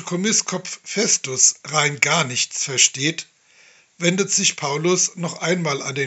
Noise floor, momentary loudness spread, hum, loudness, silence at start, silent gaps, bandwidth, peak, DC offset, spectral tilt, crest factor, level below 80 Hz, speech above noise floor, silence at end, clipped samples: -53 dBFS; 8 LU; none; -19 LUFS; 0 s; none; 8.4 kHz; 0 dBFS; under 0.1%; -2 dB/octave; 22 dB; -74 dBFS; 32 dB; 0 s; under 0.1%